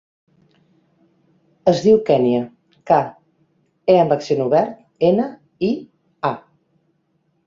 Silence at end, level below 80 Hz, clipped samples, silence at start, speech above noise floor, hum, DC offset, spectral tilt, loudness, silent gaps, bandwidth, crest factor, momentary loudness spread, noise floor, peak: 1.1 s; -60 dBFS; under 0.1%; 1.65 s; 50 dB; none; under 0.1%; -7 dB/octave; -18 LUFS; none; 7.6 kHz; 18 dB; 13 LU; -66 dBFS; -2 dBFS